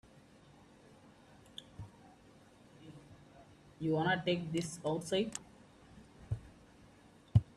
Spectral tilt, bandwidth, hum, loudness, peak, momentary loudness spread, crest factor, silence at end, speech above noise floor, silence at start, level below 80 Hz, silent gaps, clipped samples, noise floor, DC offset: -5.5 dB/octave; 13 kHz; none; -37 LUFS; -14 dBFS; 27 LU; 26 dB; 0.15 s; 26 dB; 1.55 s; -60 dBFS; none; under 0.1%; -62 dBFS; under 0.1%